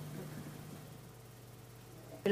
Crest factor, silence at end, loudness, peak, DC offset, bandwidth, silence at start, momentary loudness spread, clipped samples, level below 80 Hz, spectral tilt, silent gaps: 24 dB; 0 s; -49 LUFS; -18 dBFS; under 0.1%; 15.5 kHz; 0 s; 9 LU; under 0.1%; -70 dBFS; -6 dB/octave; none